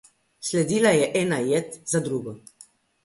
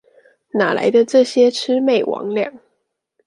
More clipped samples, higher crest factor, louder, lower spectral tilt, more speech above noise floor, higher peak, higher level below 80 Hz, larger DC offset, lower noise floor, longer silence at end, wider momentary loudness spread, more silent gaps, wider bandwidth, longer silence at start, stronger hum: neither; about the same, 18 dB vs 16 dB; second, -23 LUFS vs -16 LUFS; about the same, -4.5 dB/octave vs -4.5 dB/octave; second, 31 dB vs 56 dB; second, -6 dBFS vs -2 dBFS; first, -64 dBFS vs -72 dBFS; neither; second, -54 dBFS vs -71 dBFS; about the same, 0.65 s vs 0.7 s; first, 14 LU vs 9 LU; neither; about the same, 11.5 kHz vs 11.5 kHz; second, 0.4 s vs 0.55 s; neither